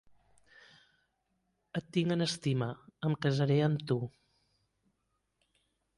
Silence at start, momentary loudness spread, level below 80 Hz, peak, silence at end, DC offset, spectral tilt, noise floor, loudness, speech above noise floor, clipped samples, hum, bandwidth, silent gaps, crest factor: 1.75 s; 12 LU; -70 dBFS; -16 dBFS; 1.9 s; under 0.1%; -6.5 dB/octave; -81 dBFS; -33 LUFS; 50 dB; under 0.1%; none; 11.5 kHz; none; 18 dB